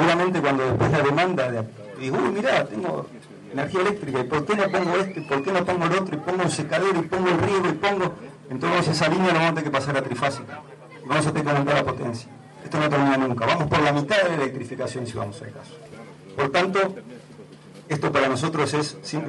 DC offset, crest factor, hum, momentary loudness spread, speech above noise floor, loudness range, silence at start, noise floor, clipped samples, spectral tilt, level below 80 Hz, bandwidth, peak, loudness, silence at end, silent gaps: under 0.1%; 16 dB; none; 18 LU; 22 dB; 3 LU; 0 s; -44 dBFS; under 0.1%; -5.5 dB/octave; -54 dBFS; 11.5 kHz; -6 dBFS; -23 LUFS; 0 s; none